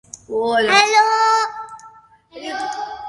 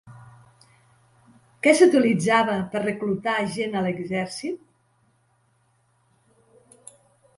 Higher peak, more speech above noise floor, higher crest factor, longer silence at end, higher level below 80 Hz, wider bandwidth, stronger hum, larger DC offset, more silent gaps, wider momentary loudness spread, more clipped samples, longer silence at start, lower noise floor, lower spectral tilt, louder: first, 0 dBFS vs -4 dBFS; second, 32 dB vs 44 dB; about the same, 18 dB vs 22 dB; second, 0 s vs 2.8 s; about the same, -60 dBFS vs -64 dBFS; about the same, 11.5 kHz vs 11.5 kHz; neither; neither; neither; first, 20 LU vs 13 LU; neither; about the same, 0.15 s vs 0.05 s; second, -46 dBFS vs -65 dBFS; second, -1 dB/octave vs -5 dB/octave; first, -16 LUFS vs -22 LUFS